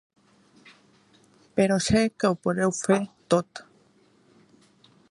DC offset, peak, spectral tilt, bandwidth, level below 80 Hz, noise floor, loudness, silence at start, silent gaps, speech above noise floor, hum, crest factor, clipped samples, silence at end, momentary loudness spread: under 0.1%; -6 dBFS; -5 dB/octave; 11.5 kHz; -54 dBFS; -61 dBFS; -24 LUFS; 1.55 s; none; 37 dB; none; 20 dB; under 0.1%; 1.5 s; 8 LU